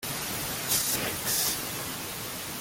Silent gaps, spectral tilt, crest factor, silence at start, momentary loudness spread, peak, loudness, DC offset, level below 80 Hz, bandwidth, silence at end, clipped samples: none; -1.5 dB/octave; 20 dB; 0 s; 9 LU; -12 dBFS; -28 LUFS; under 0.1%; -56 dBFS; 17 kHz; 0 s; under 0.1%